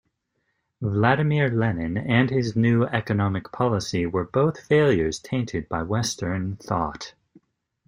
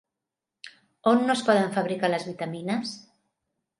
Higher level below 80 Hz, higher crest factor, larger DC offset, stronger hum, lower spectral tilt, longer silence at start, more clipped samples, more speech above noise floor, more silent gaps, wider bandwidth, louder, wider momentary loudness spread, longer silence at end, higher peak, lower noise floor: first, -50 dBFS vs -76 dBFS; about the same, 20 dB vs 20 dB; neither; neither; about the same, -6 dB/octave vs -5.5 dB/octave; first, 0.8 s vs 0.65 s; neither; second, 52 dB vs 62 dB; neither; first, 15.5 kHz vs 11.5 kHz; about the same, -23 LUFS vs -25 LUFS; second, 8 LU vs 24 LU; about the same, 0.8 s vs 0.8 s; about the same, -4 dBFS vs -6 dBFS; second, -74 dBFS vs -87 dBFS